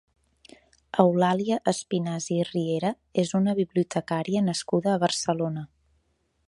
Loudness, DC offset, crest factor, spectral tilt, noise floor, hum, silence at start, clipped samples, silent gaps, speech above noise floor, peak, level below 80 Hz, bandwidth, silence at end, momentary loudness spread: -26 LUFS; under 0.1%; 22 dB; -5.5 dB/octave; -71 dBFS; none; 0.95 s; under 0.1%; none; 46 dB; -4 dBFS; -66 dBFS; 11.5 kHz; 0.8 s; 6 LU